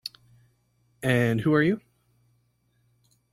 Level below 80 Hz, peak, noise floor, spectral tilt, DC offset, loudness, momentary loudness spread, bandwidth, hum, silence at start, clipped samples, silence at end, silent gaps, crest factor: -60 dBFS; -8 dBFS; -69 dBFS; -7 dB/octave; under 0.1%; -24 LUFS; 11 LU; 15 kHz; 60 Hz at -50 dBFS; 0.05 s; under 0.1%; 1.55 s; none; 20 dB